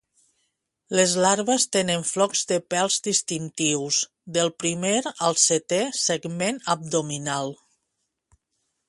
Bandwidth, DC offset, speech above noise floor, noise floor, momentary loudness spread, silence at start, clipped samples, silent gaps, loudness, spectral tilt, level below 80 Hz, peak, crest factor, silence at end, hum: 11.5 kHz; under 0.1%; 54 dB; -78 dBFS; 8 LU; 0.9 s; under 0.1%; none; -23 LUFS; -2.5 dB/octave; -68 dBFS; -4 dBFS; 22 dB; 1.35 s; none